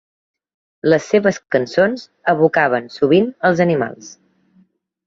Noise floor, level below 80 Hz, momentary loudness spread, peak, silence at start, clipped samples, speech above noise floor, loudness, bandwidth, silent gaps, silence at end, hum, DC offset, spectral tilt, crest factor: -57 dBFS; -60 dBFS; 7 LU; -2 dBFS; 0.85 s; under 0.1%; 41 dB; -16 LUFS; 7.6 kHz; none; 0.95 s; none; under 0.1%; -6 dB/octave; 16 dB